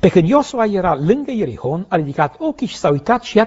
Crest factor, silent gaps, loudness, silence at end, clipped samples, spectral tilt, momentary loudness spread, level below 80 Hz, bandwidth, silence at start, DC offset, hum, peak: 16 dB; none; -17 LUFS; 0 s; under 0.1%; -6 dB/octave; 8 LU; -44 dBFS; 8 kHz; 0.05 s; under 0.1%; none; 0 dBFS